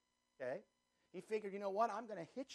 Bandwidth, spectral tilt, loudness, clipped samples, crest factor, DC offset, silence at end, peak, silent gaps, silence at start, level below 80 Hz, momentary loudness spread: 12 kHz; -5.5 dB/octave; -44 LUFS; under 0.1%; 22 dB; under 0.1%; 0 s; -24 dBFS; none; 0.4 s; under -90 dBFS; 13 LU